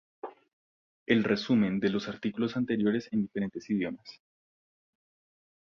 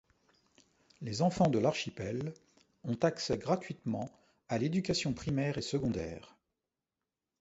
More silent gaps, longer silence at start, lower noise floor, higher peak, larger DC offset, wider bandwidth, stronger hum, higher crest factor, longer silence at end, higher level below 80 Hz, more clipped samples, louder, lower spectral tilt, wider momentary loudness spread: first, 0.53-1.06 s vs none; second, 0.25 s vs 1 s; about the same, under -90 dBFS vs under -90 dBFS; about the same, -12 dBFS vs -14 dBFS; neither; second, 6.8 kHz vs 8.2 kHz; neither; about the same, 20 dB vs 22 dB; first, 1.55 s vs 1.15 s; second, -66 dBFS vs -60 dBFS; neither; first, -30 LUFS vs -34 LUFS; about the same, -7 dB/octave vs -6 dB/octave; first, 20 LU vs 14 LU